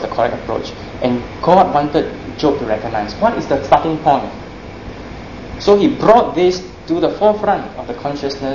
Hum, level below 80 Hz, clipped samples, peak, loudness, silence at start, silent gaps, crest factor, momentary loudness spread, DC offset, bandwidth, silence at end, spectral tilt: none; -38 dBFS; under 0.1%; 0 dBFS; -16 LUFS; 0 s; none; 16 dB; 19 LU; 0.4%; 7.4 kHz; 0 s; -6.5 dB/octave